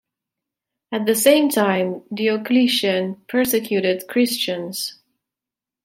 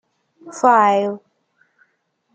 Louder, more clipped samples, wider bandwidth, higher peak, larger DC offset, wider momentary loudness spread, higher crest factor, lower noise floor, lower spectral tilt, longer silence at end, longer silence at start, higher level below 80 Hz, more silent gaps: second, -19 LUFS vs -16 LUFS; neither; first, 16.5 kHz vs 9.2 kHz; about the same, -2 dBFS vs -2 dBFS; neither; second, 10 LU vs 22 LU; about the same, 20 dB vs 18 dB; first, -88 dBFS vs -67 dBFS; second, -3.5 dB/octave vs -5 dB/octave; second, 0.9 s vs 1.2 s; first, 0.9 s vs 0.45 s; first, -66 dBFS vs -76 dBFS; neither